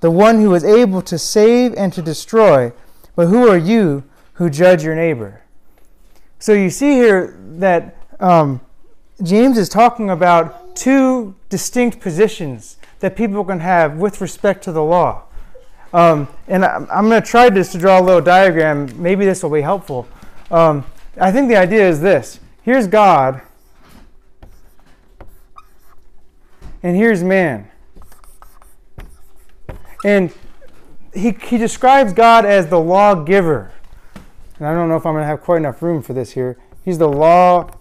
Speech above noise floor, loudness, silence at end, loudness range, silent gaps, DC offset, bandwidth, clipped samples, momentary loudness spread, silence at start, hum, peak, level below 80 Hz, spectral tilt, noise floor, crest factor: 30 dB; -13 LUFS; 0.1 s; 7 LU; none; under 0.1%; 15.5 kHz; under 0.1%; 14 LU; 0 s; none; -2 dBFS; -42 dBFS; -6 dB/octave; -43 dBFS; 12 dB